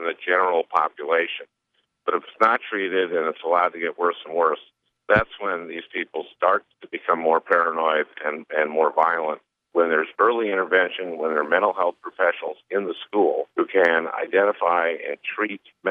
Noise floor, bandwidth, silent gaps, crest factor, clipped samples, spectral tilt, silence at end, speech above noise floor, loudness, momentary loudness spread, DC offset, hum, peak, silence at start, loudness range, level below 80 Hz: -72 dBFS; 5.6 kHz; none; 20 dB; under 0.1%; -6.5 dB/octave; 0 s; 50 dB; -22 LUFS; 9 LU; under 0.1%; none; -4 dBFS; 0 s; 2 LU; -58 dBFS